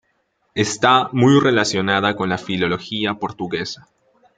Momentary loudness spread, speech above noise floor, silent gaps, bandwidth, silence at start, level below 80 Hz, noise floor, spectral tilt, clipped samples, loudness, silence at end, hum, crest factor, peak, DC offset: 12 LU; 49 dB; none; 9.4 kHz; 0.55 s; -58 dBFS; -67 dBFS; -4.5 dB/octave; under 0.1%; -18 LUFS; 0.6 s; none; 18 dB; 0 dBFS; under 0.1%